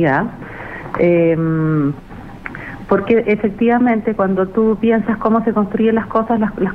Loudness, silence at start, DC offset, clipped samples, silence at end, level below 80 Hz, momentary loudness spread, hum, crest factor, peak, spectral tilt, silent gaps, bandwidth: -16 LUFS; 0 s; under 0.1%; under 0.1%; 0 s; -42 dBFS; 15 LU; none; 14 dB; -2 dBFS; -10 dB/octave; none; 4.6 kHz